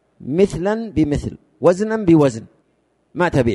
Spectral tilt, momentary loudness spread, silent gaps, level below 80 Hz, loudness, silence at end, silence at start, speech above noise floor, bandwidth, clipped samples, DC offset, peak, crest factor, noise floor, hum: -7.5 dB/octave; 12 LU; none; -40 dBFS; -18 LUFS; 0 s; 0.2 s; 47 dB; 11.5 kHz; under 0.1%; under 0.1%; -2 dBFS; 16 dB; -63 dBFS; none